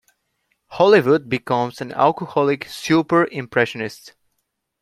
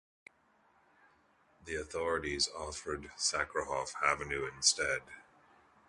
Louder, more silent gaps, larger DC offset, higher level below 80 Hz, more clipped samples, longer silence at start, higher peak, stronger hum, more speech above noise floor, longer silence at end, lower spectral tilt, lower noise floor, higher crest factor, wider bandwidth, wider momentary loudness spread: first, -19 LUFS vs -34 LUFS; neither; neither; about the same, -62 dBFS vs -58 dBFS; neither; second, 0.7 s vs 1.65 s; first, -2 dBFS vs -14 dBFS; neither; first, 56 dB vs 34 dB; about the same, 0.75 s vs 0.65 s; first, -6 dB/octave vs -1 dB/octave; first, -74 dBFS vs -70 dBFS; second, 18 dB vs 24 dB; first, 14.5 kHz vs 11.5 kHz; about the same, 11 LU vs 13 LU